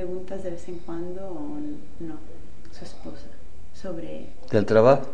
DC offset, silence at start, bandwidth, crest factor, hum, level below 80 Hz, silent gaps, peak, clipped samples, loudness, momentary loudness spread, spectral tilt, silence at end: 6%; 0 s; 9.8 kHz; 22 dB; none; -48 dBFS; none; -4 dBFS; under 0.1%; -26 LUFS; 26 LU; -7.5 dB/octave; 0 s